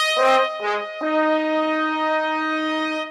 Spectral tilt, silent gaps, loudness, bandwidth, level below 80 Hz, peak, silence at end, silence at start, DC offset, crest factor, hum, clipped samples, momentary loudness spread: -2 dB/octave; none; -21 LUFS; 13.5 kHz; -68 dBFS; -8 dBFS; 0 s; 0 s; under 0.1%; 14 dB; none; under 0.1%; 7 LU